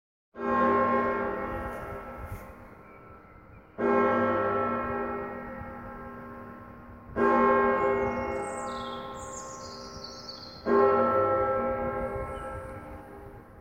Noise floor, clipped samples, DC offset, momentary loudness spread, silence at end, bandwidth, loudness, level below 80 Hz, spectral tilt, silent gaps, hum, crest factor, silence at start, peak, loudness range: -51 dBFS; under 0.1%; under 0.1%; 21 LU; 0 s; 15.5 kHz; -28 LUFS; -50 dBFS; -6 dB/octave; none; none; 20 dB; 0.35 s; -10 dBFS; 4 LU